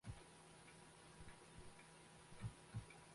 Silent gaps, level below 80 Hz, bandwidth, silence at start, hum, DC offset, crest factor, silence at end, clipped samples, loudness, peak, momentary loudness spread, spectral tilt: none; -68 dBFS; 11.5 kHz; 0.05 s; none; under 0.1%; 20 dB; 0 s; under 0.1%; -59 LUFS; -38 dBFS; 7 LU; -4.5 dB/octave